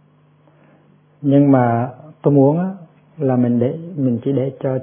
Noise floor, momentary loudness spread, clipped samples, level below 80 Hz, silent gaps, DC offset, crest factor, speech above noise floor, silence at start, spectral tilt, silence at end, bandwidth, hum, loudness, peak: -53 dBFS; 11 LU; under 0.1%; -64 dBFS; none; under 0.1%; 16 dB; 37 dB; 1.2 s; -13.5 dB/octave; 0 s; 3.5 kHz; 50 Hz at -45 dBFS; -17 LUFS; 0 dBFS